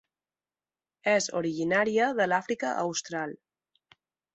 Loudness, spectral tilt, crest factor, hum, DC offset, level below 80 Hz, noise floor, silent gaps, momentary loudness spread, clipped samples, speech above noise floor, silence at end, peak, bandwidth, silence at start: -28 LUFS; -3.5 dB/octave; 20 dB; none; under 0.1%; -74 dBFS; under -90 dBFS; none; 9 LU; under 0.1%; over 62 dB; 1 s; -10 dBFS; 8.2 kHz; 1.05 s